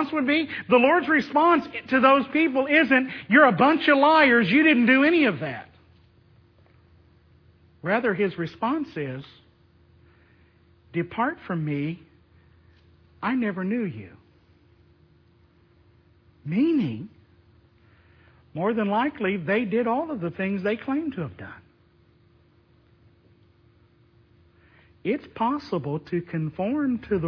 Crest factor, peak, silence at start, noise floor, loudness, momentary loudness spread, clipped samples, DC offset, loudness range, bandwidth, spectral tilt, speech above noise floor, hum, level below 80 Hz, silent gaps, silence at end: 22 dB; -2 dBFS; 0 s; -59 dBFS; -23 LUFS; 16 LU; under 0.1%; under 0.1%; 14 LU; 5.4 kHz; -8 dB/octave; 37 dB; none; -62 dBFS; none; 0 s